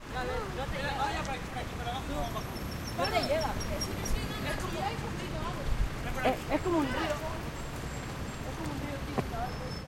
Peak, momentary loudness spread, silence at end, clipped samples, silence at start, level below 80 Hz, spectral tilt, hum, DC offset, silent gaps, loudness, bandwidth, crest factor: -14 dBFS; 8 LU; 0 s; under 0.1%; 0 s; -40 dBFS; -5 dB/octave; none; under 0.1%; none; -34 LUFS; 16 kHz; 18 dB